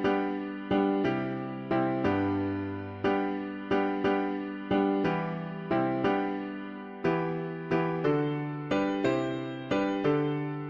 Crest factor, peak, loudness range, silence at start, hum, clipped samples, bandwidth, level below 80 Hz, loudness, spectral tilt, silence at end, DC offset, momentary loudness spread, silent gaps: 14 dB; -14 dBFS; 1 LU; 0 s; none; under 0.1%; 7.4 kHz; -60 dBFS; -30 LUFS; -8 dB/octave; 0 s; under 0.1%; 8 LU; none